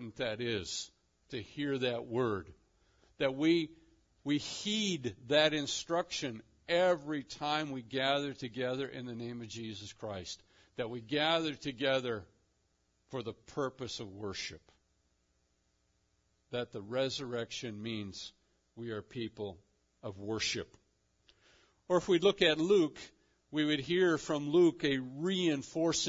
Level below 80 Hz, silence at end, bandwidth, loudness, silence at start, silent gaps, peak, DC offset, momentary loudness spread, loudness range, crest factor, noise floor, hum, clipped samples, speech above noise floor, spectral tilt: -70 dBFS; 0 s; 7.4 kHz; -34 LUFS; 0 s; none; -14 dBFS; under 0.1%; 15 LU; 11 LU; 22 dB; -76 dBFS; none; under 0.1%; 42 dB; -3.5 dB/octave